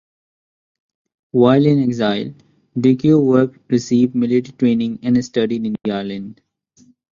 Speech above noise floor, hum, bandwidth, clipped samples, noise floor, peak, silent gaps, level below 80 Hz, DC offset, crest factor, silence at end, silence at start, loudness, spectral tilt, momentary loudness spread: 38 dB; none; 7.4 kHz; under 0.1%; -53 dBFS; -2 dBFS; none; -56 dBFS; under 0.1%; 16 dB; 0.8 s; 1.35 s; -17 LUFS; -7.5 dB/octave; 11 LU